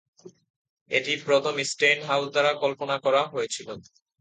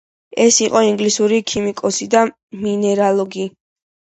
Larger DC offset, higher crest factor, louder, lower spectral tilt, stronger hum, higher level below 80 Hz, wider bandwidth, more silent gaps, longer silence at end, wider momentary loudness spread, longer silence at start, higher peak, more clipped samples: neither; about the same, 18 dB vs 16 dB; second, -24 LUFS vs -16 LUFS; about the same, -2.5 dB/octave vs -3.5 dB/octave; neither; second, -74 dBFS vs -56 dBFS; about the same, 9.4 kHz vs 8.8 kHz; first, 0.50-0.86 s vs 2.43-2.48 s; second, 0.4 s vs 0.65 s; about the same, 10 LU vs 12 LU; about the same, 0.25 s vs 0.35 s; second, -8 dBFS vs 0 dBFS; neither